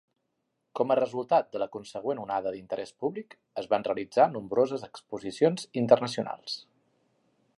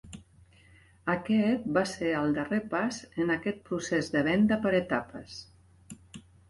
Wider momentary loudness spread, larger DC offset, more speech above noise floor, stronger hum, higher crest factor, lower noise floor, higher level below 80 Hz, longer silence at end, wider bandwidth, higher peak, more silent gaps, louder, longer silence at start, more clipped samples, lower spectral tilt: second, 14 LU vs 20 LU; neither; first, 51 dB vs 30 dB; neither; first, 24 dB vs 18 dB; first, -79 dBFS vs -58 dBFS; second, -74 dBFS vs -60 dBFS; first, 0.95 s vs 0.3 s; about the same, 11.5 kHz vs 11.5 kHz; first, -6 dBFS vs -12 dBFS; neither; about the same, -29 LUFS vs -29 LUFS; first, 0.75 s vs 0.05 s; neither; about the same, -5.5 dB/octave vs -5.5 dB/octave